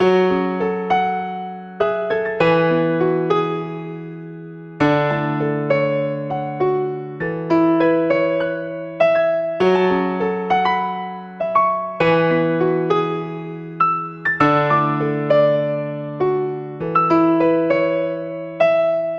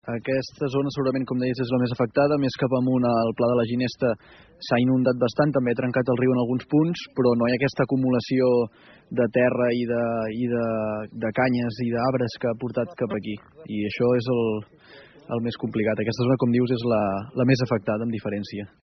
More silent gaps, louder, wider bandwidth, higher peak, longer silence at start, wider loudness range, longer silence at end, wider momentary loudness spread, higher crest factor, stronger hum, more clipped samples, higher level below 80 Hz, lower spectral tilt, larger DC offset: neither; first, -18 LUFS vs -24 LUFS; about the same, 7 kHz vs 6.4 kHz; first, -2 dBFS vs -6 dBFS; about the same, 0 s vs 0.05 s; about the same, 3 LU vs 4 LU; second, 0 s vs 0.15 s; first, 11 LU vs 8 LU; about the same, 16 dB vs 16 dB; neither; neither; about the same, -56 dBFS vs -58 dBFS; first, -8 dB/octave vs -6.5 dB/octave; neither